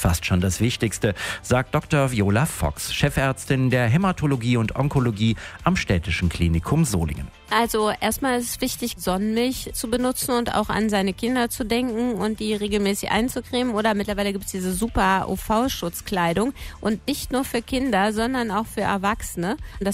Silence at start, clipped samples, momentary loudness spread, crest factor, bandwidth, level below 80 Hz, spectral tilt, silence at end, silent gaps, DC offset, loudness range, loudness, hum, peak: 0 s; under 0.1%; 5 LU; 18 dB; 16 kHz; -40 dBFS; -5 dB/octave; 0 s; none; under 0.1%; 2 LU; -23 LUFS; none; -4 dBFS